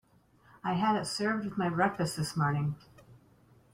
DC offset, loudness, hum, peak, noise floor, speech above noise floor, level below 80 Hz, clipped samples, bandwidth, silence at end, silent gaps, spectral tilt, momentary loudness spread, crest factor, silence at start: under 0.1%; -31 LUFS; none; -14 dBFS; -63 dBFS; 33 dB; -64 dBFS; under 0.1%; 16 kHz; 0.55 s; none; -5.5 dB/octave; 7 LU; 18 dB; 0.65 s